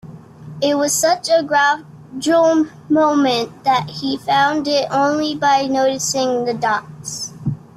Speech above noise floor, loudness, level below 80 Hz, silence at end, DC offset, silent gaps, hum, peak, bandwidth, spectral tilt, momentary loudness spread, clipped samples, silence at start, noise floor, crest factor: 20 dB; -17 LUFS; -58 dBFS; 0.2 s; under 0.1%; none; none; -4 dBFS; 15.5 kHz; -3.5 dB/octave; 10 LU; under 0.1%; 0.05 s; -36 dBFS; 14 dB